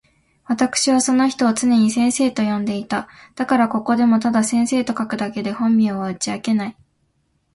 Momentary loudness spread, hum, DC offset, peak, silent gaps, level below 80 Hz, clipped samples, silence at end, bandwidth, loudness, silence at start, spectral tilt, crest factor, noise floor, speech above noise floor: 8 LU; none; under 0.1%; -4 dBFS; none; -58 dBFS; under 0.1%; 0.85 s; 11.5 kHz; -19 LUFS; 0.5 s; -4 dB/octave; 16 dB; -66 dBFS; 48 dB